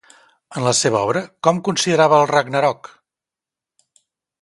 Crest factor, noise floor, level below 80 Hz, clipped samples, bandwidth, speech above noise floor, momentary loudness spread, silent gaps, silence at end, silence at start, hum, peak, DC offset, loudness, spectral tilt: 20 dB; -88 dBFS; -62 dBFS; under 0.1%; 11.5 kHz; 71 dB; 9 LU; none; 1.7 s; 0.5 s; none; 0 dBFS; under 0.1%; -17 LUFS; -4 dB/octave